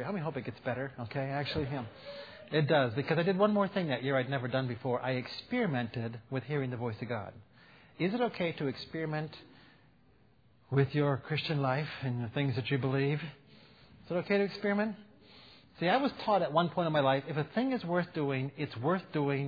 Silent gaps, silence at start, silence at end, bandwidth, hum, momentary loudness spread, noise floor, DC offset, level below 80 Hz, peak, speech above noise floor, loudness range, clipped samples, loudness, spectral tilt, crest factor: none; 0 s; 0 s; 5 kHz; none; 10 LU; -65 dBFS; under 0.1%; -66 dBFS; -14 dBFS; 33 dB; 5 LU; under 0.1%; -33 LUFS; -5 dB/octave; 20 dB